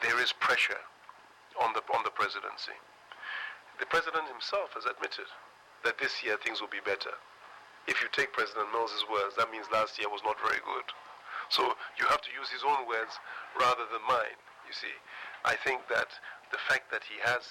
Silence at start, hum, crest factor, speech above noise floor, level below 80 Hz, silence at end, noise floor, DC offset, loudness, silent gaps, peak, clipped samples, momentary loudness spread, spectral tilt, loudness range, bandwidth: 0 s; none; 16 dB; 23 dB; -72 dBFS; 0 s; -55 dBFS; under 0.1%; -32 LUFS; none; -18 dBFS; under 0.1%; 14 LU; -1.5 dB/octave; 3 LU; 16.5 kHz